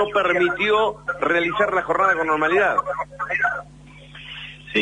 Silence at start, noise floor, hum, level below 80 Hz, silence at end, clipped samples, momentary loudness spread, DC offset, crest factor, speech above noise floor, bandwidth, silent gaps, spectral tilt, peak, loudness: 0 s; -42 dBFS; 50 Hz at -45 dBFS; -52 dBFS; 0 s; under 0.1%; 16 LU; under 0.1%; 16 dB; 22 dB; 10 kHz; none; -5 dB/octave; -6 dBFS; -20 LUFS